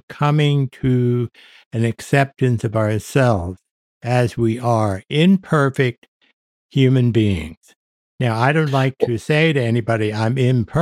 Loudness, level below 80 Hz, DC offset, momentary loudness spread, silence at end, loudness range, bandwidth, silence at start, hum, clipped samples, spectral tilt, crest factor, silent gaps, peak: -18 LUFS; -48 dBFS; under 0.1%; 7 LU; 0 s; 2 LU; 13.5 kHz; 0.1 s; none; under 0.1%; -7 dB/octave; 16 dB; 1.66-1.71 s, 3.71-4.01 s, 5.98-6.02 s, 6.08-6.20 s, 6.33-6.69 s, 7.57-7.61 s, 7.76-8.18 s; -2 dBFS